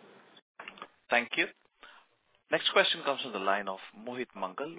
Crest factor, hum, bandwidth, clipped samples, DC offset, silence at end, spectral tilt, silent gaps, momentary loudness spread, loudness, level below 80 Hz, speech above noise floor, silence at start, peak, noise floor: 24 dB; none; 4 kHz; under 0.1%; under 0.1%; 0 s; 0 dB/octave; none; 21 LU; -30 LUFS; -84 dBFS; 37 dB; 0.6 s; -10 dBFS; -69 dBFS